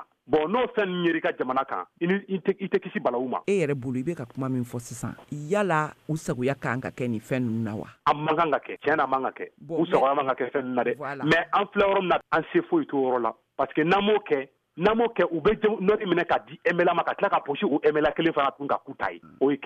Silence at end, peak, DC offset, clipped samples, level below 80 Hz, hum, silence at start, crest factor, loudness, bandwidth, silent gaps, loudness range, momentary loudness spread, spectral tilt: 0 s; -8 dBFS; under 0.1%; under 0.1%; -58 dBFS; none; 0 s; 18 dB; -26 LUFS; 14 kHz; none; 4 LU; 8 LU; -6.5 dB/octave